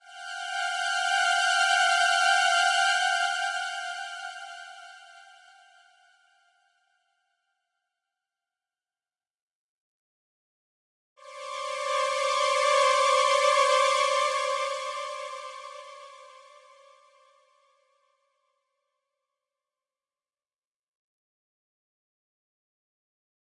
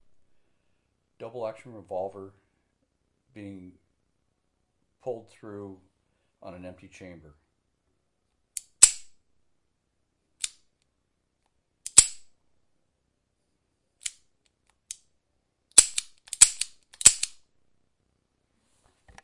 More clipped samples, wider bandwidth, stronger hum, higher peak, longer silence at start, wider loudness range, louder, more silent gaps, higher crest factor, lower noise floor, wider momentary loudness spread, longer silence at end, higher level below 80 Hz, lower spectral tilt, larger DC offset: neither; about the same, 11.5 kHz vs 12 kHz; neither; second, -10 dBFS vs 0 dBFS; second, 0.1 s vs 1.2 s; second, 19 LU vs 23 LU; second, -24 LUFS vs -19 LUFS; first, 9.42-9.48 s, 9.55-11.16 s vs none; second, 20 dB vs 30 dB; first, under -90 dBFS vs -77 dBFS; second, 20 LU vs 25 LU; first, 7.25 s vs 1.95 s; second, under -90 dBFS vs -60 dBFS; second, 7 dB/octave vs 1 dB/octave; neither